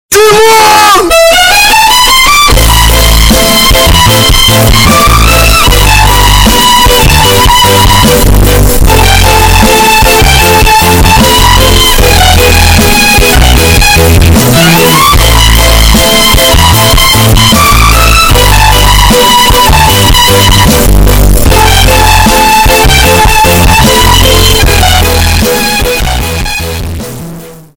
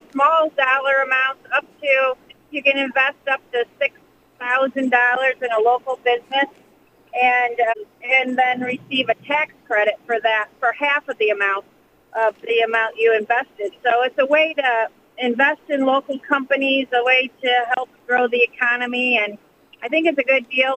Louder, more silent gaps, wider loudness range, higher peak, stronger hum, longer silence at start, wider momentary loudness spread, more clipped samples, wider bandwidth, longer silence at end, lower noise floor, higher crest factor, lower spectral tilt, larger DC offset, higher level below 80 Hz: first, -3 LUFS vs -19 LUFS; neither; about the same, 1 LU vs 2 LU; about the same, 0 dBFS vs -2 dBFS; neither; about the same, 0.1 s vs 0.15 s; second, 3 LU vs 7 LU; first, 4% vs under 0.1%; first, over 20 kHz vs 8.6 kHz; first, 0.2 s vs 0 s; second, -24 dBFS vs -54 dBFS; second, 4 dB vs 18 dB; about the same, -3 dB/octave vs -4 dB/octave; first, 2% vs under 0.1%; first, -10 dBFS vs -72 dBFS